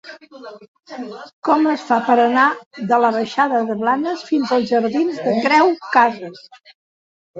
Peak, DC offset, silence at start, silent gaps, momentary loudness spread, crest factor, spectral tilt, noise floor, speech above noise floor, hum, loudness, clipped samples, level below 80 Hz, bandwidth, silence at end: -2 dBFS; under 0.1%; 0.05 s; 0.68-0.75 s, 1.33-1.42 s, 2.66-2.71 s, 6.75-7.34 s; 18 LU; 16 dB; -5.5 dB/octave; under -90 dBFS; over 72 dB; none; -17 LUFS; under 0.1%; -68 dBFS; 7.8 kHz; 0 s